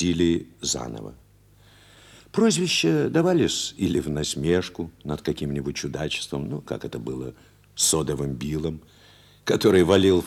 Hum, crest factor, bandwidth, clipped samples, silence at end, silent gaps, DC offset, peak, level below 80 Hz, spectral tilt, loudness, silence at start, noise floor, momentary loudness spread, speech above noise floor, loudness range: 50 Hz at -50 dBFS; 20 dB; 16 kHz; under 0.1%; 0 s; none; under 0.1%; -4 dBFS; -50 dBFS; -4.5 dB/octave; -24 LUFS; 0 s; -55 dBFS; 14 LU; 31 dB; 5 LU